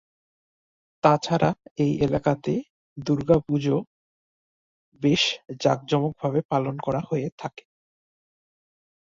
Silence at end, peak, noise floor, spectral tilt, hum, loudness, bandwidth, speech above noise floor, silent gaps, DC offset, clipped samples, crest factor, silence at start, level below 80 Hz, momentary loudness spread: 1.5 s; -2 dBFS; under -90 dBFS; -6 dB/octave; none; -24 LUFS; 7.6 kHz; over 66 dB; 1.71-1.76 s, 2.70-2.96 s, 3.87-4.92 s, 6.45-6.49 s, 7.32-7.38 s; under 0.1%; under 0.1%; 24 dB; 1.05 s; -54 dBFS; 8 LU